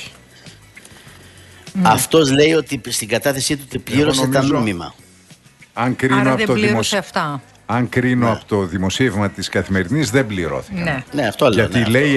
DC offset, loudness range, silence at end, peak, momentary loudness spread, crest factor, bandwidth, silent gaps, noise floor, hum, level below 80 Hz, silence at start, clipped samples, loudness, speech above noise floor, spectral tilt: under 0.1%; 3 LU; 0 s; 0 dBFS; 9 LU; 18 dB; 12.5 kHz; none; -46 dBFS; none; -46 dBFS; 0 s; under 0.1%; -17 LUFS; 30 dB; -5 dB/octave